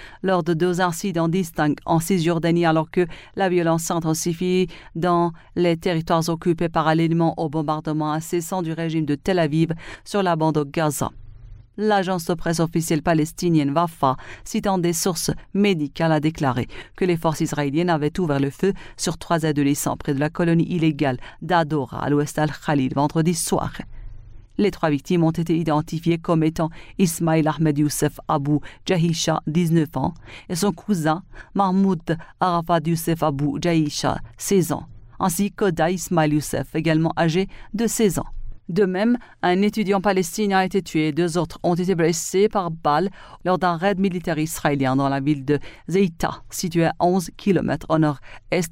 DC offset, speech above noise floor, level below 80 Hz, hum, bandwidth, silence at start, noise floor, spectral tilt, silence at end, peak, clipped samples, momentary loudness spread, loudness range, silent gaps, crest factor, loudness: under 0.1%; 20 dB; -44 dBFS; none; 16 kHz; 0 s; -41 dBFS; -5.5 dB/octave; 0 s; -6 dBFS; under 0.1%; 6 LU; 2 LU; none; 16 dB; -22 LUFS